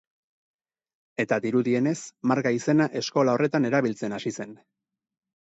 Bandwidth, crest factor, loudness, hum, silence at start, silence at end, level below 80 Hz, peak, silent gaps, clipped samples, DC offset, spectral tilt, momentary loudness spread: 8.2 kHz; 18 dB; -25 LUFS; none; 1.2 s; 0.9 s; -72 dBFS; -8 dBFS; none; under 0.1%; under 0.1%; -6 dB/octave; 10 LU